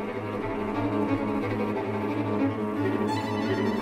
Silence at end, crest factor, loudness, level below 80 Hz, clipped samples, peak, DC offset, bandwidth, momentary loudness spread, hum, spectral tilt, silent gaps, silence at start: 0 s; 14 dB; -28 LUFS; -52 dBFS; under 0.1%; -14 dBFS; under 0.1%; 13.5 kHz; 4 LU; none; -7.5 dB/octave; none; 0 s